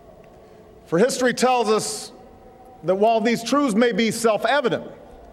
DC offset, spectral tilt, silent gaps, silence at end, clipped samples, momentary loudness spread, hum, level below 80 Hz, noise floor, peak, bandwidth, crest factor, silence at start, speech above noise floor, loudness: under 0.1%; -4 dB/octave; none; 0.05 s; under 0.1%; 11 LU; none; -58 dBFS; -47 dBFS; -6 dBFS; 15 kHz; 16 dB; 0.9 s; 27 dB; -20 LUFS